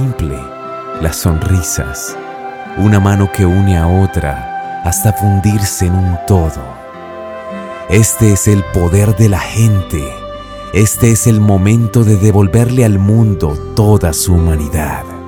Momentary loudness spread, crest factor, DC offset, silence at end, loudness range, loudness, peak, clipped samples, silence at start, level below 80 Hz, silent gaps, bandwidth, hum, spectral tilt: 15 LU; 12 dB; under 0.1%; 0 s; 4 LU; -12 LUFS; 0 dBFS; under 0.1%; 0 s; -26 dBFS; none; 18 kHz; none; -6 dB/octave